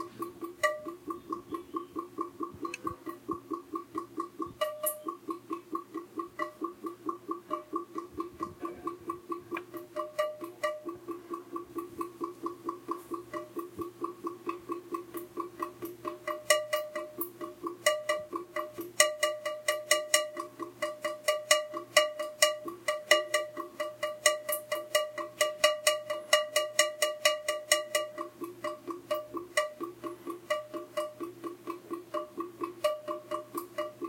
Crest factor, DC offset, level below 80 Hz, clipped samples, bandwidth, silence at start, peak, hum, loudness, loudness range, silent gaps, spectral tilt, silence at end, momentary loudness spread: 32 dB; under 0.1%; -76 dBFS; under 0.1%; 17 kHz; 0 s; -2 dBFS; none; -33 LUFS; 11 LU; none; -1 dB/octave; 0 s; 14 LU